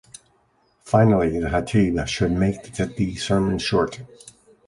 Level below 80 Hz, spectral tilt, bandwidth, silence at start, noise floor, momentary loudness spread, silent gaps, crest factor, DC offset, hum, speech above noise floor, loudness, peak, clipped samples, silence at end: -40 dBFS; -6.5 dB/octave; 11.5 kHz; 0.85 s; -63 dBFS; 10 LU; none; 18 dB; under 0.1%; none; 42 dB; -21 LUFS; -4 dBFS; under 0.1%; 0.35 s